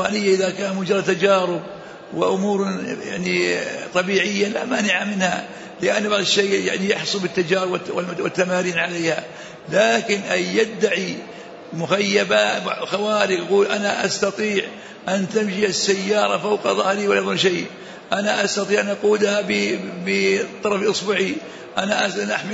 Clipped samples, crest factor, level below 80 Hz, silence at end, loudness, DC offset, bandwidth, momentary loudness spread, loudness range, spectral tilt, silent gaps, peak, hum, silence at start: under 0.1%; 16 dB; -64 dBFS; 0 s; -20 LUFS; under 0.1%; 8 kHz; 9 LU; 1 LU; -3.5 dB/octave; none; -4 dBFS; none; 0 s